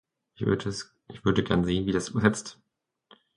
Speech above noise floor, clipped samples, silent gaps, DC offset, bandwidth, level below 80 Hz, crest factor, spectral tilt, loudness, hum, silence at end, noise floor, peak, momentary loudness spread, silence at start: 37 dB; under 0.1%; none; under 0.1%; 11 kHz; -50 dBFS; 22 dB; -5.5 dB/octave; -27 LUFS; none; 0.85 s; -64 dBFS; -6 dBFS; 13 LU; 0.4 s